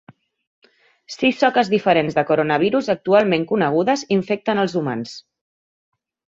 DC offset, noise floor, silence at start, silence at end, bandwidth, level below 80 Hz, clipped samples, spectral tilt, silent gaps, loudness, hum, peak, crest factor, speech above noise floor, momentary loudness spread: under 0.1%; under -90 dBFS; 1.1 s; 1.15 s; 7.8 kHz; -62 dBFS; under 0.1%; -5.5 dB/octave; none; -19 LUFS; none; -2 dBFS; 18 dB; over 72 dB; 9 LU